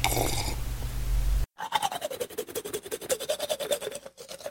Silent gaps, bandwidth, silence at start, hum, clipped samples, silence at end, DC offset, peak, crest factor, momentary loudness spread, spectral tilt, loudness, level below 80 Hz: none; 17 kHz; 0 s; none; under 0.1%; 0 s; under 0.1%; -4 dBFS; 26 dB; 7 LU; -3 dB/octave; -32 LUFS; -34 dBFS